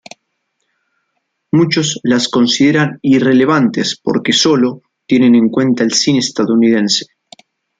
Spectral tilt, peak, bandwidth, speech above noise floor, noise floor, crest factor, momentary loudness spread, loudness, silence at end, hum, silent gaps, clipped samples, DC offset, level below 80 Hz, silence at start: -4.5 dB/octave; 0 dBFS; 9.4 kHz; 57 dB; -69 dBFS; 12 dB; 6 LU; -12 LUFS; 0.75 s; none; none; under 0.1%; under 0.1%; -56 dBFS; 1.55 s